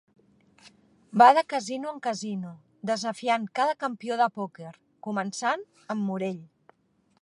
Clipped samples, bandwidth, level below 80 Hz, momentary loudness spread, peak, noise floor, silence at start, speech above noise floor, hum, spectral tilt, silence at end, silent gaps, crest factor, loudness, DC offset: under 0.1%; 11 kHz; -80 dBFS; 19 LU; -4 dBFS; -68 dBFS; 0.65 s; 42 dB; none; -4.5 dB/octave; 0.8 s; none; 24 dB; -27 LUFS; under 0.1%